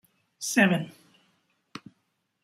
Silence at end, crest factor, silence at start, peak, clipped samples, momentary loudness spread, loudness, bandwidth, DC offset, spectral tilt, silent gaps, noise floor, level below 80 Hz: 0.65 s; 22 dB; 0.4 s; -8 dBFS; under 0.1%; 24 LU; -25 LUFS; 15.5 kHz; under 0.1%; -4.5 dB/octave; none; -76 dBFS; -72 dBFS